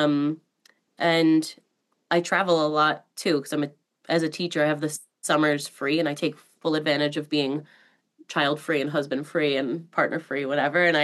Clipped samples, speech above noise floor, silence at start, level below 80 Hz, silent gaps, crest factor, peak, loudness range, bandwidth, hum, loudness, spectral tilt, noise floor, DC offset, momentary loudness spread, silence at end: under 0.1%; 39 dB; 0 s; -90 dBFS; none; 18 dB; -8 dBFS; 3 LU; 12.5 kHz; none; -25 LUFS; -4.5 dB/octave; -63 dBFS; under 0.1%; 9 LU; 0 s